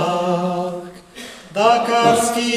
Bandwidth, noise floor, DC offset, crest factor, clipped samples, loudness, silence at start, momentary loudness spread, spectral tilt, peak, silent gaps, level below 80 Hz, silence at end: 15.5 kHz; -37 dBFS; under 0.1%; 18 dB; under 0.1%; -17 LUFS; 0 s; 20 LU; -4 dB/octave; 0 dBFS; none; -56 dBFS; 0 s